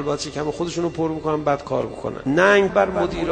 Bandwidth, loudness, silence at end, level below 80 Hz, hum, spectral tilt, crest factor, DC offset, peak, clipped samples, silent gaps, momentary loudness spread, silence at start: 9.4 kHz; -21 LUFS; 0 s; -44 dBFS; none; -5.5 dB/octave; 20 dB; under 0.1%; -2 dBFS; under 0.1%; none; 10 LU; 0 s